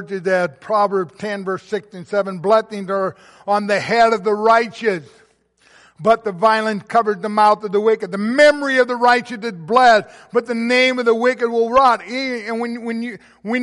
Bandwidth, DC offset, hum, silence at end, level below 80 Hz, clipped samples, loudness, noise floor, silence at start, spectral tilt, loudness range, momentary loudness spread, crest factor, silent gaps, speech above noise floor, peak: 11.5 kHz; under 0.1%; none; 0 s; -60 dBFS; under 0.1%; -17 LUFS; -56 dBFS; 0 s; -4.5 dB/octave; 4 LU; 12 LU; 16 dB; none; 39 dB; -2 dBFS